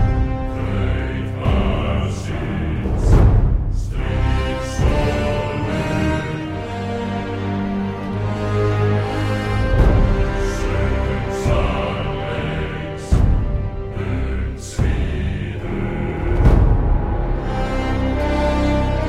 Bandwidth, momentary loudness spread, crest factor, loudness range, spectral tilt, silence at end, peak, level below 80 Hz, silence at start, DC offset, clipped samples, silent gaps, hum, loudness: 11 kHz; 8 LU; 18 dB; 3 LU; -7 dB/octave; 0 s; 0 dBFS; -22 dBFS; 0 s; under 0.1%; under 0.1%; none; none; -20 LUFS